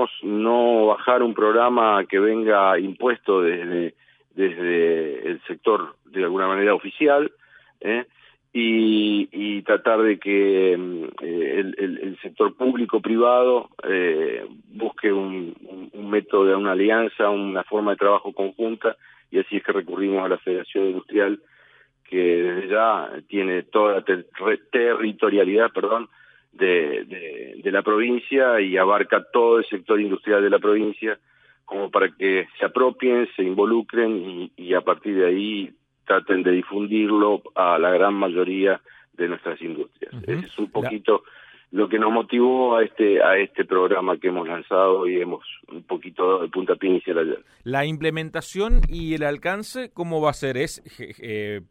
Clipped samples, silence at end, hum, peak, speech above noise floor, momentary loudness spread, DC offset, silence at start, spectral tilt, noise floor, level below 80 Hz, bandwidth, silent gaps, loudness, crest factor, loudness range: under 0.1%; 0.1 s; none; -4 dBFS; 35 dB; 12 LU; under 0.1%; 0 s; -6 dB/octave; -56 dBFS; -38 dBFS; 11.5 kHz; none; -21 LUFS; 16 dB; 5 LU